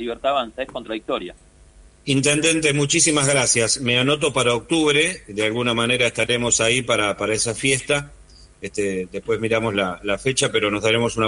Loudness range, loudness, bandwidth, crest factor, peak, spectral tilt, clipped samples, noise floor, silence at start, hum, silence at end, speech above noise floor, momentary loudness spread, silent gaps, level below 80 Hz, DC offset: 5 LU; -19 LUFS; 11 kHz; 16 dB; -4 dBFS; -3 dB/octave; under 0.1%; -49 dBFS; 0 s; none; 0 s; 28 dB; 11 LU; none; -48 dBFS; under 0.1%